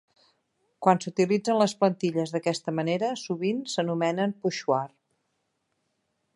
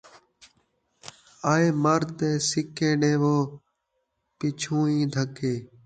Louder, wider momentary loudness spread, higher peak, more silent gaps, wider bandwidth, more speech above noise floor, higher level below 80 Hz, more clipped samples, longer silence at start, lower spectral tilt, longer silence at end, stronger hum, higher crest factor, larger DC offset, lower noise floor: about the same, -27 LUFS vs -25 LUFS; second, 5 LU vs 11 LU; first, -4 dBFS vs -8 dBFS; neither; first, 11.5 kHz vs 9.4 kHz; about the same, 51 dB vs 53 dB; second, -76 dBFS vs -64 dBFS; neither; second, 0.8 s vs 1.05 s; about the same, -5.5 dB/octave vs -5.5 dB/octave; first, 1.5 s vs 0.2 s; neither; about the same, 22 dB vs 18 dB; neither; about the same, -77 dBFS vs -77 dBFS